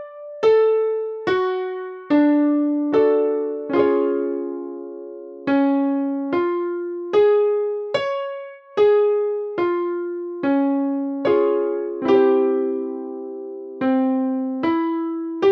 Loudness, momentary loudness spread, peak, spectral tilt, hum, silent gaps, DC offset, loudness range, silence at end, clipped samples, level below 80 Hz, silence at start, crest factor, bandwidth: -20 LUFS; 13 LU; -6 dBFS; -7 dB/octave; none; none; under 0.1%; 2 LU; 0 s; under 0.1%; -68 dBFS; 0 s; 14 dB; 6.2 kHz